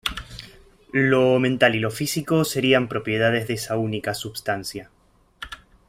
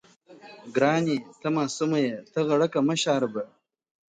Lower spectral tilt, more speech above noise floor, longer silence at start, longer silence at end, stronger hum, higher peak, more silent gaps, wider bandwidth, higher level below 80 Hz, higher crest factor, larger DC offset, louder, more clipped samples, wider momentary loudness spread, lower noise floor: about the same, -5 dB/octave vs -5 dB/octave; about the same, 27 dB vs 25 dB; second, 0.05 s vs 0.3 s; second, 0.35 s vs 0.65 s; neither; first, -2 dBFS vs -8 dBFS; neither; first, 16 kHz vs 9.4 kHz; first, -50 dBFS vs -74 dBFS; about the same, 20 dB vs 18 dB; neither; first, -22 LUFS vs -26 LUFS; neither; first, 20 LU vs 8 LU; about the same, -48 dBFS vs -50 dBFS